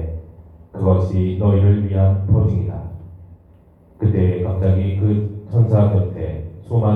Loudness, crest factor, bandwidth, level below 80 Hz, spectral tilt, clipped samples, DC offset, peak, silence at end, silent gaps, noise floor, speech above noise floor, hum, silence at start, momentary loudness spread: -18 LUFS; 14 dB; 3.7 kHz; -40 dBFS; -11.5 dB/octave; under 0.1%; under 0.1%; -2 dBFS; 0 s; none; -48 dBFS; 33 dB; none; 0 s; 15 LU